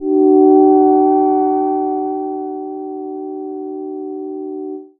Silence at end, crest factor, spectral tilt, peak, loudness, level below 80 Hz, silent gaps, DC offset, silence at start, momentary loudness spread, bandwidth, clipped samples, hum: 0.15 s; 14 dB; -10.5 dB/octave; 0 dBFS; -13 LUFS; -60 dBFS; none; under 0.1%; 0 s; 16 LU; 2.4 kHz; under 0.1%; none